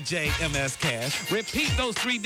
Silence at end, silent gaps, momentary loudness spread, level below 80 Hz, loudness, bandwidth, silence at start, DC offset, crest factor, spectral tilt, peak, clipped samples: 0 s; none; 2 LU; -40 dBFS; -26 LUFS; 20 kHz; 0 s; under 0.1%; 14 dB; -3 dB/octave; -12 dBFS; under 0.1%